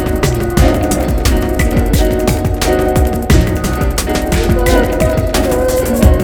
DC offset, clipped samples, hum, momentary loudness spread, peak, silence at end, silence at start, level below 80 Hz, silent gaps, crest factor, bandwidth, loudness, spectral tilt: 0.7%; 0.3%; none; 3 LU; 0 dBFS; 0 s; 0 s; -16 dBFS; none; 12 dB; over 20 kHz; -13 LUFS; -5.5 dB/octave